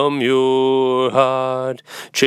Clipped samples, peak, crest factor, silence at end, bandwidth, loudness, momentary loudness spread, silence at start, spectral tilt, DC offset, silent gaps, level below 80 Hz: under 0.1%; -2 dBFS; 16 dB; 0 s; 15 kHz; -17 LUFS; 9 LU; 0 s; -4.5 dB/octave; under 0.1%; none; -74 dBFS